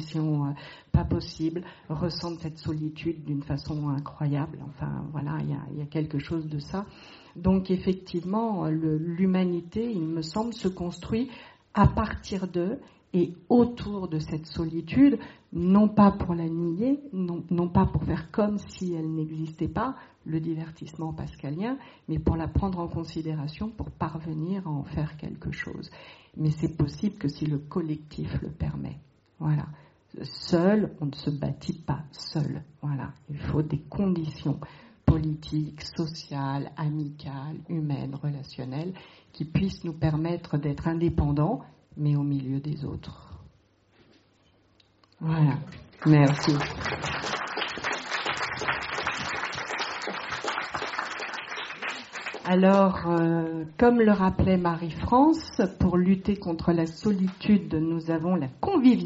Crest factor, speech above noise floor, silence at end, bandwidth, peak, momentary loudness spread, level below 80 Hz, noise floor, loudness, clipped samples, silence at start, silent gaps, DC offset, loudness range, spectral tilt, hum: 20 dB; 36 dB; 0 s; 8 kHz; -6 dBFS; 13 LU; -46 dBFS; -63 dBFS; -28 LUFS; under 0.1%; 0 s; none; under 0.1%; 8 LU; -6.5 dB/octave; none